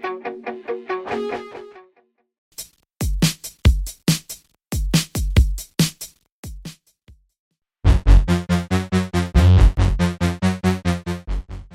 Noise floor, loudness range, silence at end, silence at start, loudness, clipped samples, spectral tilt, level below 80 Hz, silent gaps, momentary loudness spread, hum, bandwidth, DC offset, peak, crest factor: -62 dBFS; 7 LU; 0.1 s; 0.05 s; -21 LUFS; under 0.1%; -5.5 dB/octave; -24 dBFS; 2.38-2.52 s, 6.32-6.43 s, 7.39-7.51 s; 20 LU; none; 16.5 kHz; under 0.1%; -2 dBFS; 18 dB